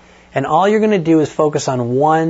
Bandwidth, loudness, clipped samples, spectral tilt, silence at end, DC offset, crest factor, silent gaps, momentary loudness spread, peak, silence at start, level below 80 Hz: 8 kHz; -15 LUFS; under 0.1%; -6 dB/octave; 0 s; under 0.1%; 12 dB; none; 6 LU; -2 dBFS; 0.35 s; -52 dBFS